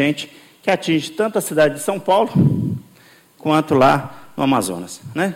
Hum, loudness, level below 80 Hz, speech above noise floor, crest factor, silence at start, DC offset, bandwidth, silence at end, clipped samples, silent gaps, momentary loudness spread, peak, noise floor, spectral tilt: none; -18 LUFS; -54 dBFS; 32 dB; 14 dB; 0 s; under 0.1%; 16.5 kHz; 0 s; under 0.1%; none; 13 LU; -4 dBFS; -49 dBFS; -5.5 dB/octave